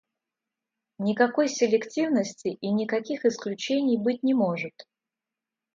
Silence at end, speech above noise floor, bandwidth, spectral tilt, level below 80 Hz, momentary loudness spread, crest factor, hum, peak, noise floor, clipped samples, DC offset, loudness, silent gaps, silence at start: 0.95 s; 64 dB; 7.6 kHz; -5 dB/octave; -76 dBFS; 8 LU; 20 dB; none; -6 dBFS; -89 dBFS; under 0.1%; under 0.1%; -26 LUFS; none; 1 s